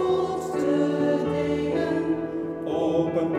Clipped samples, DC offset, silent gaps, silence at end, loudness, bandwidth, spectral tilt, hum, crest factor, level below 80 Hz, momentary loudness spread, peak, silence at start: under 0.1%; under 0.1%; none; 0 s; -25 LUFS; 13 kHz; -7 dB/octave; none; 12 dB; -54 dBFS; 5 LU; -12 dBFS; 0 s